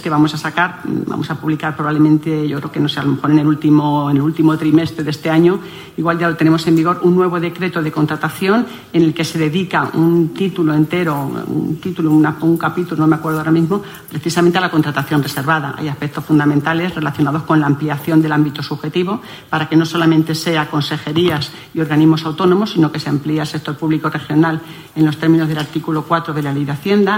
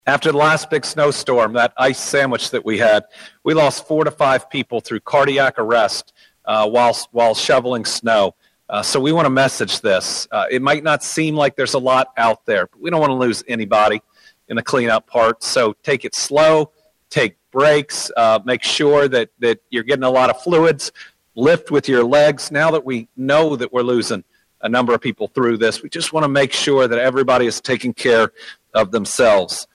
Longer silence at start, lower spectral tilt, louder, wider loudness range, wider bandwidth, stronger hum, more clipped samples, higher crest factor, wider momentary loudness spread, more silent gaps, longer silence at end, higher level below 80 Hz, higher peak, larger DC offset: about the same, 0 s vs 0.05 s; first, -6.5 dB/octave vs -4 dB/octave; about the same, -16 LUFS vs -16 LUFS; about the same, 2 LU vs 2 LU; first, 16.5 kHz vs 13 kHz; neither; neither; about the same, 14 dB vs 14 dB; about the same, 7 LU vs 7 LU; neither; about the same, 0 s vs 0.1 s; about the same, -54 dBFS vs -56 dBFS; first, 0 dBFS vs -4 dBFS; neither